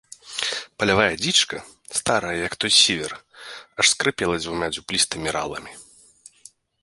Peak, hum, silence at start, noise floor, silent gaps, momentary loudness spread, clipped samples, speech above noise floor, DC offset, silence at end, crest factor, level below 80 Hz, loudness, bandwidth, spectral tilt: -2 dBFS; none; 0.25 s; -52 dBFS; none; 18 LU; under 0.1%; 29 dB; under 0.1%; 1 s; 22 dB; -52 dBFS; -21 LUFS; 11.5 kHz; -1.5 dB/octave